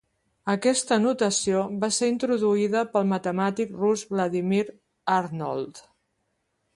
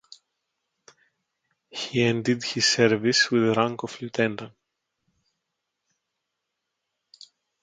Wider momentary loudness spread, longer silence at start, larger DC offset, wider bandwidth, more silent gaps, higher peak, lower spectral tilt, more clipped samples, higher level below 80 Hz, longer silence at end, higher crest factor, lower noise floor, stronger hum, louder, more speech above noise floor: second, 8 LU vs 14 LU; second, 0.45 s vs 1.75 s; neither; first, 11.5 kHz vs 9.4 kHz; neither; second, -8 dBFS vs -4 dBFS; about the same, -4.5 dB/octave vs -4 dB/octave; neither; about the same, -66 dBFS vs -68 dBFS; second, 0.95 s vs 3.15 s; second, 16 dB vs 22 dB; second, -75 dBFS vs -82 dBFS; neither; about the same, -25 LUFS vs -23 LUFS; second, 51 dB vs 59 dB